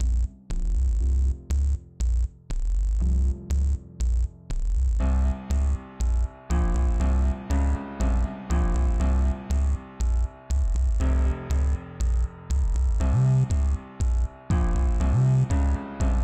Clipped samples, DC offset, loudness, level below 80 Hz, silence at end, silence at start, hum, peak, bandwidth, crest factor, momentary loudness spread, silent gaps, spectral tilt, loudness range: under 0.1%; under 0.1%; -26 LUFS; -24 dBFS; 0 s; 0 s; none; -14 dBFS; 8.6 kHz; 10 dB; 7 LU; none; -7.5 dB/octave; 3 LU